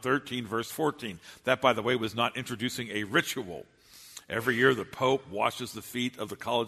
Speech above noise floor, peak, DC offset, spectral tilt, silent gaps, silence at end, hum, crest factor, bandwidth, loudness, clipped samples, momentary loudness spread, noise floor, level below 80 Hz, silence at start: 21 dB; -8 dBFS; under 0.1%; -4 dB/octave; none; 0 s; none; 22 dB; 13.5 kHz; -29 LUFS; under 0.1%; 13 LU; -51 dBFS; -66 dBFS; 0 s